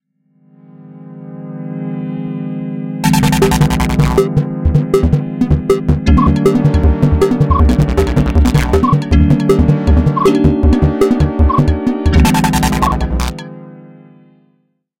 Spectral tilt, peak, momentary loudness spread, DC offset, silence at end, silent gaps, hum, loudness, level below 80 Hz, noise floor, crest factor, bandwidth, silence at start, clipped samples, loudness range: -7 dB/octave; 0 dBFS; 11 LU; under 0.1%; 1.15 s; none; none; -13 LUFS; -18 dBFS; -60 dBFS; 12 dB; 16.5 kHz; 0.8 s; under 0.1%; 4 LU